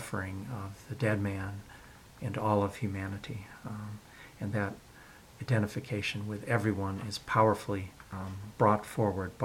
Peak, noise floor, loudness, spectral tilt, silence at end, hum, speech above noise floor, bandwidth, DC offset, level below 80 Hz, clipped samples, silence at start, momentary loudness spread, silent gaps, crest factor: -10 dBFS; -54 dBFS; -33 LUFS; -6.5 dB/octave; 0 s; none; 22 dB; 16.5 kHz; under 0.1%; -60 dBFS; under 0.1%; 0 s; 19 LU; none; 22 dB